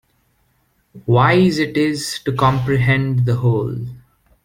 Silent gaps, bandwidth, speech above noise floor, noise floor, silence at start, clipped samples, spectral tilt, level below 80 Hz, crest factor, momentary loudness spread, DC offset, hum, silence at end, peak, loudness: none; 15.5 kHz; 46 dB; -62 dBFS; 0.95 s; under 0.1%; -6.5 dB/octave; -46 dBFS; 18 dB; 12 LU; under 0.1%; none; 0.45 s; 0 dBFS; -17 LUFS